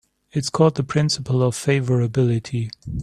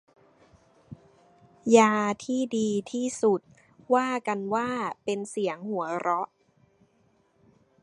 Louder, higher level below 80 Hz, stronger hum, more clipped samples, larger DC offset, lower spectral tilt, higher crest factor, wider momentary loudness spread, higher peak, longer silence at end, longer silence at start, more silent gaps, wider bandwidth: first, -21 LUFS vs -27 LUFS; first, -48 dBFS vs -72 dBFS; neither; neither; neither; first, -6 dB/octave vs -4.5 dB/octave; second, 18 dB vs 24 dB; about the same, 9 LU vs 11 LU; about the same, -2 dBFS vs -4 dBFS; second, 0 s vs 1.6 s; second, 0.35 s vs 0.9 s; neither; first, 13 kHz vs 11.5 kHz